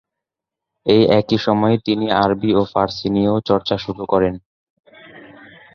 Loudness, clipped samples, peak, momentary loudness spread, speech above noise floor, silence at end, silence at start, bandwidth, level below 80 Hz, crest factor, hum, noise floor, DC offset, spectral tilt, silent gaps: -17 LUFS; under 0.1%; -2 dBFS; 7 LU; 68 dB; 0.55 s; 0.85 s; 6.8 kHz; -48 dBFS; 16 dB; none; -84 dBFS; under 0.1%; -7.5 dB/octave; 4.46-4.84 s